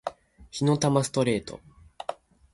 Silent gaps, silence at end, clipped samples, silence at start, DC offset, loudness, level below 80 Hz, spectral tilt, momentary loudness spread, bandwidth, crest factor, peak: none; 0.4 s; under 0.1%; 0.05 s; under 0.1%; -25 LUFS; -56 dBFS; -5.5 dB/octave; 17 LU; 11.5 kHz; 20 dB; -10 dBFS